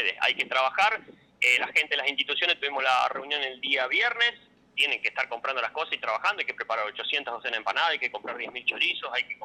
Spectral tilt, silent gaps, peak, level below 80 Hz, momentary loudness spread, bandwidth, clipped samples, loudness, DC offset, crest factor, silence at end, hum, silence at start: -0.5 dB/octave; none; -12 dBFS; -76 dBFS; 7 LU; 19 kHz; under 0.1%; -26 LUFS; under 0.1%; 16 dB; 0 s; none; 0 s